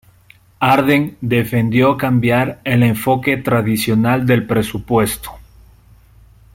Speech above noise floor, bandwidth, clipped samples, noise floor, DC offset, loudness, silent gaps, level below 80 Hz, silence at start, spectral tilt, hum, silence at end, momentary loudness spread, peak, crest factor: 34 dB; 16.5 kHz; under 0.1%; -49 dBFS; under 0.1%; -15 LUFS; none; -44 dBFS; 0.6 s; -6 dB/octave; none; 1.15 s; 5 LU; -2 dBFS; 14 dB